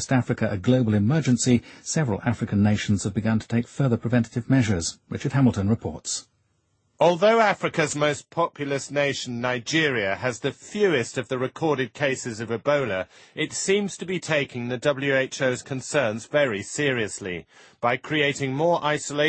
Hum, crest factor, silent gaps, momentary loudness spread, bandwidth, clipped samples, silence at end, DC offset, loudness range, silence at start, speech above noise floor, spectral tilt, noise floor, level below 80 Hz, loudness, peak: none; 18 dB; none; 8 LU; 8.8 kHz; under 0.1%; 0 s; under 0.1%; 3 LU; 0 s; 45 dB; -5 dB/octave; -69 dBFS; -56 dBFS; -24 LUFS; -6 dBFS